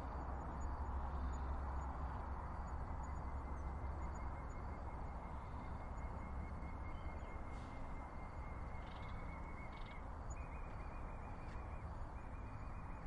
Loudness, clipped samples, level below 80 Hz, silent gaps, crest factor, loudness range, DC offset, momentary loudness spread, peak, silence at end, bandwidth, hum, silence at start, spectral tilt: -49 LUFS; under 0.1%; -48 dBFS; none; 14 dB; 4 LU; under 0.1%; 6 LU; -32 dBFS; 0 s; 10.5 kHz; none; 0 s; -7.5 dB/octave